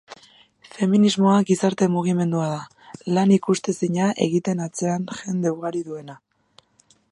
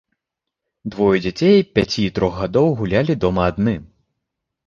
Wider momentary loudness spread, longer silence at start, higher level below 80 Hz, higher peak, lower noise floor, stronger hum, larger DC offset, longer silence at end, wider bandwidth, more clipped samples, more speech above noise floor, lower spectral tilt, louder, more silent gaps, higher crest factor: first, 14 LU vs 7 LU; second, 0.1 s vs 0.85 s; second, -68 dBFS vs -40 dBFS; second, -4 dBFS vs 0 dBFS; second, -60 dBFS vs -82 dBFS; neither; neither; about the same, 0.95 s vs 0.85 s; first, 11.5 kHz vs 7.2 kHz; neither; second, 39 dB vs 65 dB; about the same, -6 dB/octave vs -7 dB/octave; second, -21 LUFS vs -18 LUFS; neither; about the same, 18 dB vs 18 dB